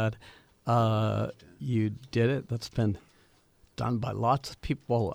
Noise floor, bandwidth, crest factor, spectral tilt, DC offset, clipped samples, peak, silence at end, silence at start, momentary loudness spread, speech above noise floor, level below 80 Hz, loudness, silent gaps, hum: -63 dBFS; 14 kHz; 18 dB; -7.5 dB/octave; under 0.1%; under 0.1%; -12 dBFS; 0 s; 0 s; 12 LU; 34 dB; -54 dBFS; -30 LUFS; none; none